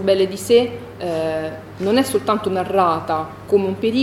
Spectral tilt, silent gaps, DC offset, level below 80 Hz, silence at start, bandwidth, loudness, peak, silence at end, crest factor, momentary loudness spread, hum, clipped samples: -5 dB/octave; none; under 0.1%; -52 dBFS; 0 s; 16.5 kHz; -19 LUFS; -2 dBFS; 0 s; 16 dB; 9 LU; none; under 0.1%